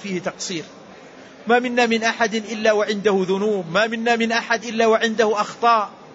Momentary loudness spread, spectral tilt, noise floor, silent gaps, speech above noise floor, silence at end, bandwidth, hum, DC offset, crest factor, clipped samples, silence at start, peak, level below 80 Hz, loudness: 9 LU; -4 dB/octave; -42 dBFS; none; 23 dB; 0 s; 8 kHz; none; under 0.1%; 16 dB; under 0.1%; 0 s; -4 dBFS; -66 dBFS; -19 LUFS